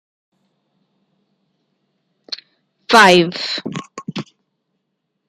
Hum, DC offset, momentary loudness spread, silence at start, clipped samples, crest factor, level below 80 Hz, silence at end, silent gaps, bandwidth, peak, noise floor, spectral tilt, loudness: none; under 0.1%; 22 LU; 2.3 s; under 0.1%; 20 dB; -62 dBFS; 1.05 s; none; 15.5 kHz; 0 dBFS; -73 dBFS; -4 dB/octave; -12 LUFS